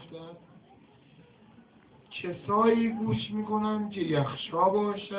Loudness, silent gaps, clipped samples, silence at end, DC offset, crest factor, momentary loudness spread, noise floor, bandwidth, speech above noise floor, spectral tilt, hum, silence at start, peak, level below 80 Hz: -28 LUFS; none; under 0.1%; 0 s; under 0.1%; 20 dB; 17 LU; -57 dBFS; 4 kHz; 30 dB; -5.5 dB/octave; none; 0 s; -12 dBFS; -64 dBFS